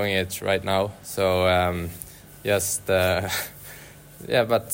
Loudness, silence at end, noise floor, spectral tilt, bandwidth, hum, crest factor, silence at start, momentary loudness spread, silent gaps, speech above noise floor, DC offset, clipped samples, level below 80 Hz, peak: -24 LUFS; 0 s; -44 dBFS; -4 dB/octave; 16.5 kHz; none; 18 dB; 0 s; 19 LU; none; 21 dB; under 0.1%; under 0.1%; -50 dBFS; -8 dBFS